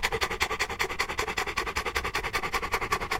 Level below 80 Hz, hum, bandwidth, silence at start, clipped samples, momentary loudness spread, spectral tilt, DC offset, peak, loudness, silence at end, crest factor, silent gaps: -42 dBFS; none; 17 kHz; 0 s; under 0.1%; 1 LU; -2.5 dB/octave; under 0.1%; -8 dBFS; -29 LUFS; 0 s; 22 dB; none